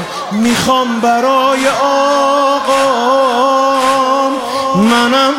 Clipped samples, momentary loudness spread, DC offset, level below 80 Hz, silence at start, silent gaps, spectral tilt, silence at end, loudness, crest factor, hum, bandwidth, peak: under 0.1%; 4 LU; under 0.1%; -50 dBFS; 0 s; none; -4 dB/octave; 0 s; -11 LUFS; 12 dB; none; 16.5 kHz; 0 dBFS